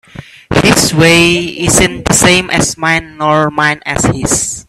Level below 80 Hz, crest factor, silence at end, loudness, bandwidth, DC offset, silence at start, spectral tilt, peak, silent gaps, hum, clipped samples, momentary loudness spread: -32 dBFS; 10 dB; 0.05 s; -10 LUFS; 16.5 kHz; under 0.1%; 0.15 s; -3.5 dB/octave; 0 dBFS; none; none; 0.2%; 6 LU